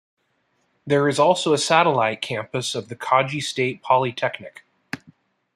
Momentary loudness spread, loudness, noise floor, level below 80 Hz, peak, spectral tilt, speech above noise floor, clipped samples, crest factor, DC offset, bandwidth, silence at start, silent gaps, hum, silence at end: 18 LU; -21 LUFS; -68 dBFS; -68 dBFS; -2 dBFS; -4 dB/octave; 48 dB; under 0.1%; 20 dB; under 0.1%; 14 kHz; 0.85 s; none; none; 0.6 s